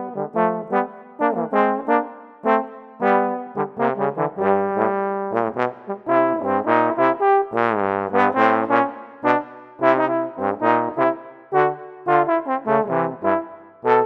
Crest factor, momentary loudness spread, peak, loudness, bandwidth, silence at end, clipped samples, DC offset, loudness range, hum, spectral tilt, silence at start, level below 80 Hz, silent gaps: 20 dB; 8 LU; 0 dBFS; -21 LUFS; 6.4 kHz; 0 s; under 0.1%; under 0.1%; 3 LU; none; -8.5 dB/octave; 0 s; -72 dBFS; none